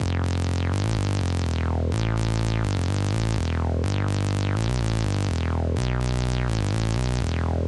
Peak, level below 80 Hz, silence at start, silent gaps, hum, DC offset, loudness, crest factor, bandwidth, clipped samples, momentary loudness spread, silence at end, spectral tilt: -12 dBFS; -32 dBFS; 0 s; none; none; under 0.1%; -25 LUFS; 12 dB; 11.5 kHz; under 0.1%; 1 LU; 0 s; -6 dB/octave